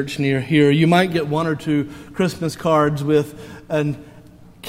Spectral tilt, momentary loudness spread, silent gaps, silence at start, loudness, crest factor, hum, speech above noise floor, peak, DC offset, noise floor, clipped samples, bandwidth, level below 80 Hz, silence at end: -6.5 dB/octave; 11 LU; none; 0 s; -19 LUFS; 18 dB; none; 25 dB; -2 dBFS; under 0.1%; -44 dBFS; under 0.1%; 16 kHz; -50 dBFS; 0 s